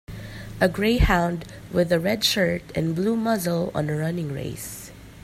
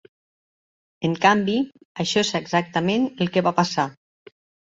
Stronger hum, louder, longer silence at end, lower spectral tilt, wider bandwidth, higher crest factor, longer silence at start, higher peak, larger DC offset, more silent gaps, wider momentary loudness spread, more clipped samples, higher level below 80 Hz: neither; about the same, -23 LUFS vs -22 LUFS; second, 0.05 s vs 0.8 s; about the same, -5 dB/octave vs -5 dB/octave; first, 16 kHz vs 8 kHz; about the same, 18 dB vs 22 dB; second, 0.1 s vs 1 s; second, -6 dBFS vs -2 dBFS; neither; second, none vs 1.85-1.95 s; first, 15 LU vs 10 LU; neither; first, -36 dBFS vs -62 dBFS